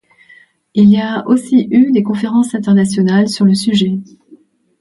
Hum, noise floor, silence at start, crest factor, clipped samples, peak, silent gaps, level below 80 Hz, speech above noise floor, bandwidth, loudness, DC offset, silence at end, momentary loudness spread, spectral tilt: none; -46 dBFS; 0.75 s; 12 dB; under 0.1%; 0 dBFS; none; -54 dBFS; 34 dB; 11.5 kHz; -12 LUFS; under 0.1%; 0.75 s; 5 LU; -6.5 dB/octave